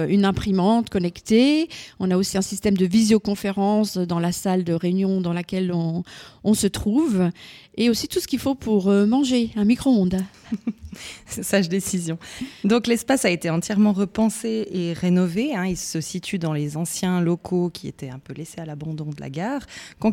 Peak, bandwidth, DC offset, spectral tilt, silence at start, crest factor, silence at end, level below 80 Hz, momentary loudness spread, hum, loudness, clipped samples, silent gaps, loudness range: -6 dBFS; 16.5 kHz; under 0.1%; -5.5 dB/octave; 0 s; 16 dB; 0 s; -50 dBFS; 13 LU; none; -22 LUFS; under 0.1%; none; 5 LU